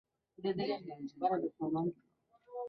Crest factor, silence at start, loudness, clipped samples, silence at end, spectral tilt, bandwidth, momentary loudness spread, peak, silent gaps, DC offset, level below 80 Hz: 18 dB; 0.4 s; -38 LUFS; under 0.1%; 0 s; -6 dB/octave; 6 kHz; 8 LU; -20 dBFS; none; under 0.1%; -78 dBFS